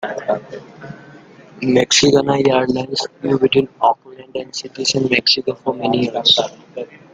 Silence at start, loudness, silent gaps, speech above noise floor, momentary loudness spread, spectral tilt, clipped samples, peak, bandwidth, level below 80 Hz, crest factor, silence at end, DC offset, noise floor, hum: 0 s; -16 LUFS; none; 25 dB; 19 LU; -3.5 dB/octave; under 0.1%; 0 dBFS; 9.6 kHz; -54 dBFS; 18 dB; 0.2 s; under 0.1%; -42 dBFS; none